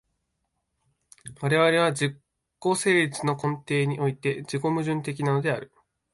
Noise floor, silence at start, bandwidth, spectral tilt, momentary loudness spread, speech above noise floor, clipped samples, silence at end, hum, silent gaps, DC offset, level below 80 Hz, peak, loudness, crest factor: -78 dBFS; 1.25 s; 11.5 kHz; -5.5 dB/octave; 9 LU; 53 dB; under 0.1%; 0.5 s; none; none; under 0.1%; -66 dBFS; -8 dBFS; -25 LUFS; 18 dB